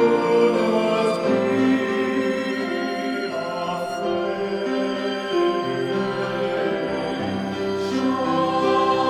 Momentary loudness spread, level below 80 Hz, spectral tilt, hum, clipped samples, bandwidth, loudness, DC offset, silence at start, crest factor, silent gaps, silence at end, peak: 7 LU; -60 dBFS; -6 dB/octave; none; under 0.1%; 14 kHz; -22 LUFS; under 0.1%; 0 s; 14 dB; none; 0 s; -6 dBFS